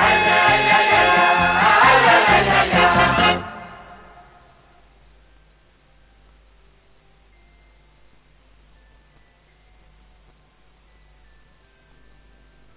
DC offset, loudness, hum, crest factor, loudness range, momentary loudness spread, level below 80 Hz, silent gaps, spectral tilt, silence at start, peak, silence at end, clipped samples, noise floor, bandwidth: under 0.1%; -14 LUFS; none; 16 dB; 10 LU; 9 LU; -44 dBFS; none; -7.5 dB/octave; 0 s; -4 dBFS; 9 s; under 0.1%; -55 dBFS; 4 kHz